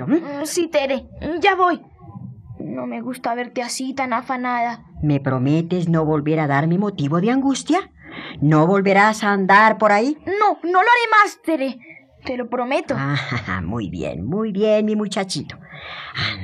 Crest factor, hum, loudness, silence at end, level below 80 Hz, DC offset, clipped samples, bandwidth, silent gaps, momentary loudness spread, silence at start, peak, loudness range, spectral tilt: 16 dB; none; -19 LUFS; 0 s; -52 dBFS; under 0.1%; under 0.1%; 13.5 kHz; none; 15 LU; 0 s; -2 dBFS; 8 LU; -5.5 dB/octave